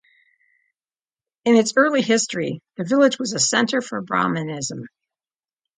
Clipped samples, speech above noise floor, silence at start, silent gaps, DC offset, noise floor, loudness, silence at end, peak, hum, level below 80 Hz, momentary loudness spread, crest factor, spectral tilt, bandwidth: under 0.1%; over 70 dB; 1.45 s; none; under 0.1%; under -90 dBFS; -20 LUFS; 0.9 s; -2 dBFS; none; -68 dBFS; 11 LU; 20 dB; -3.5 dB/octave; 9.6 kHz